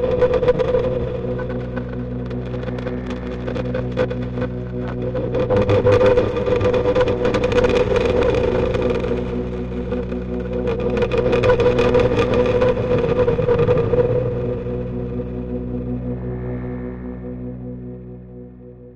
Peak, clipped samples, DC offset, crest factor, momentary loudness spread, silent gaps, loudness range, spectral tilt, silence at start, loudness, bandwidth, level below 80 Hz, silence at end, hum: -2 dBFS; under 0.1%; under 0.1%; 16 dB; 12 LU; none; 9 LU; -8 dB/octave; 0 s; -20 LUFS; 8 kHz; -32 dBFS; 0 s; none